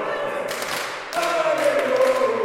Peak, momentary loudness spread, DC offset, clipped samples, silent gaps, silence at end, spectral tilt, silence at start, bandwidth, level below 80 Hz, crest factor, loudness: -8 dBFS; 7 LU; under 0.1%; under 0.1%; none; 0 s; -2.5 dB/octave; 0 s; 16.5 kHz; -62 dBFS; 14 dB; -22 LUFS